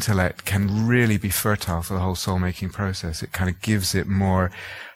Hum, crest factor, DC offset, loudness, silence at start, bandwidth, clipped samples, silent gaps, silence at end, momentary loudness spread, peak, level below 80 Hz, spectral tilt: none; 16 dB; under 0.1%; -23 LUFS; 0 s; 16.5 kHz; under 0.1%; none; 0.05 s; 8 LU; -6 dBFS; -42 dBFS; -5 dB/octave